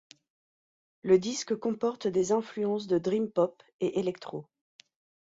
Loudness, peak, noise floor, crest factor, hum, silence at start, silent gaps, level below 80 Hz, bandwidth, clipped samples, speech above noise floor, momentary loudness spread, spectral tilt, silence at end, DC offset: -29 LUFS; -12 dBFS; under -90 dBFS; 20 dB; none; 1.05 s; 3.73-3.79 s; -70 dBFS; 7.8 kHz; under 0.1%; over 61 dB; 11 LU; -5.5 dB/octave; 0.8 s; under 0.1%